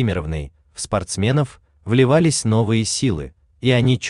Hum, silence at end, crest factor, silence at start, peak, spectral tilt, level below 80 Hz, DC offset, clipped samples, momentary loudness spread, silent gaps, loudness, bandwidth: none; 0 s; 16 dB; 0 s; -2 dBFS; -5.5 dB/octave; -42 dBFS; under 0.1%; under 0.1%; 15 LU; none; -19 LUFS; 11 kHz